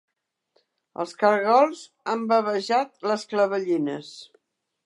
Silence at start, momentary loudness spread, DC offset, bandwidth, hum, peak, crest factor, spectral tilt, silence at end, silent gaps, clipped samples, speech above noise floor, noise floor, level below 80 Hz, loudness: 1 s; 16 LU; under 0.1%; 11 kHz; none; -6 dBFS; 20 dB; -5 dB/octave; 0.6 s; none; under 0.1%; 47 dB; -71 dBFS; -82 dBFS; -23 LUFS